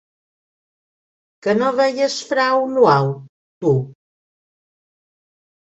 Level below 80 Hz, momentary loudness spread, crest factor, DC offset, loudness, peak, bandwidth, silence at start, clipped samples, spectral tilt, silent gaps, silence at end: -62 dBFS; 11 LU; 20 dB; under 0.1%; -18 LUFS; -2 dBFS; 8.2 kHz; 1.45 s; under 0.1%; -5.5 dB/octave; 3.29-3.61 s; 1.75 s